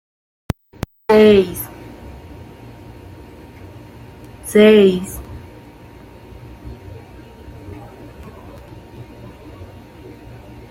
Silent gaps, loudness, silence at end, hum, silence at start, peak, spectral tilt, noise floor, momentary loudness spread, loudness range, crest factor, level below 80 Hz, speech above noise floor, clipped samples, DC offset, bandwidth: none; -14 LUFS; 1.05 s; none; 1.1 s; -2 dBFS; -6 dB/octave; -40 dBFS; 28 LU; 20 LU; 18 dB; -42 dBFS; 30 dB; under 0.1%; under 0.1%; 16 kHz